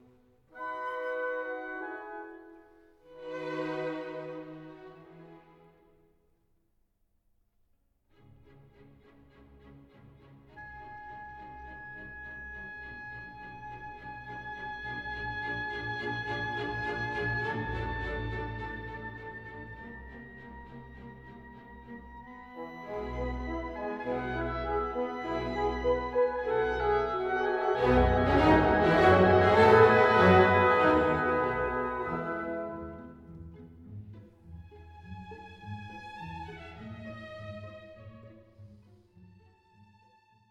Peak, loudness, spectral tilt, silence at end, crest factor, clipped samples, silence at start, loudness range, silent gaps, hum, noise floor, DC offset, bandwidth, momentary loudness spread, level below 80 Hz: -10 dBFS; -28 LUFS; -7.5 dB/octave; 1.75 s; 22 dB; under 0.1%; 0.55 s; 24 LU; none; none; -72 dBFS; under 0.1%; 9.2 kHz; 25 LU; -46 dBFS